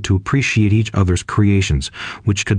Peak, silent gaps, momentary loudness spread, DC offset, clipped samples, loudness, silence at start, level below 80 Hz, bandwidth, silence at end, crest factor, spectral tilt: -4 dBFS; none; 6 LU; under 0.1%; under 0.1%; -17 LUFS; 0 s; -32 dBFS; 9.8 kHz; 0 s; 12 dB; -5.5 dB/octave